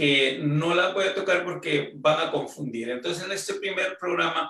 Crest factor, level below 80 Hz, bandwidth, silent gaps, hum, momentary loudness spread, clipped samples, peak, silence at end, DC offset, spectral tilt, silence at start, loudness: 18 dB; -70 dBFS; 13 kHz; none; none; 8 LU; under 0.1%; -8 dBFS; 0 s; under 0.1%; -4.5 dB/octave; 0 s; -25 LUFS